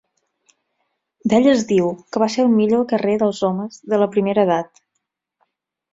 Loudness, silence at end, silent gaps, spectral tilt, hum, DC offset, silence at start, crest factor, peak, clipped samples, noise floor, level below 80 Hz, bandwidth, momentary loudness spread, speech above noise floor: -18 LUFS; 1.3 s; none; -6 dB/octave; none; under 0.1%; 1.25 s; 16 dB; -2 dBFS; under 0.1%; -76 dBFS; -60 dBFS; 7.8 kHz; 8 LU; 59 dB